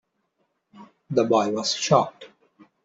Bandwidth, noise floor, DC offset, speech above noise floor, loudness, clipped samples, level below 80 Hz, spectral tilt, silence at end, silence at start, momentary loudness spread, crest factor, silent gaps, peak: 8 kHz; -73 dBFS; under 0.1%; 52 dB; -22 LUFS; under 0.1%; -66 dBFS; -4.5 dB/octave; 0.6 s; 0.75 s; 6 LU; 22 dB; none; -4 dBFS